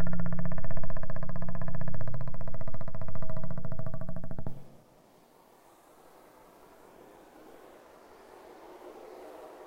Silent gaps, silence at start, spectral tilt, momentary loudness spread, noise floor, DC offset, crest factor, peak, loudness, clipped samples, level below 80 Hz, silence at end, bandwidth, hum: none; 0 s; -8.5 dB/octave; 20 LU; -60 dBFS; under 0.1%; 10 dB; -12 dBFS; -41 LUFS; under 0.1%; -40 dBFS; 0 s; 2.9 kHz; none